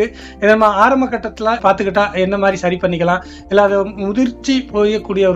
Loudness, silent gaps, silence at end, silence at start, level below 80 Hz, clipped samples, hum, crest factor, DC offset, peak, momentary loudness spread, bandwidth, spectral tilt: -15 LUFS; none; 0 s; 0 s; -40 dBFS; under 0.1%; none; 14 dB; under 0.1%; 0 dBFS; 7 LU; 8.2 kHz; -6 dB/octave